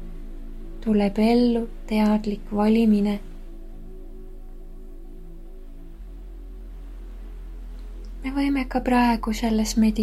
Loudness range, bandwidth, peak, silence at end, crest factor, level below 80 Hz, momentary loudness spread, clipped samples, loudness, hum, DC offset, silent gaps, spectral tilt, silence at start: 22 LU; 14 kHz; -10 dBFS; 0 s; 16 dB; -36 dBFS; 25 LU; under 0.1%; -22 LUFS; none; under 0.1%; none; -6 dB/octave; 0 s